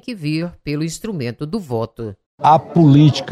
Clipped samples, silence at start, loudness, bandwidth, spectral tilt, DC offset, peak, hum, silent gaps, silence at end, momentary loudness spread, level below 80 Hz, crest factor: under 0.1%; 0.05 s; -17 LUFS; 12.5 kHz; -7 dB/octave; under 0.1%; -2 dBFS; none; 2.26-2.38 s; 0 s; 15 LU; -50 dBFS; 14 dB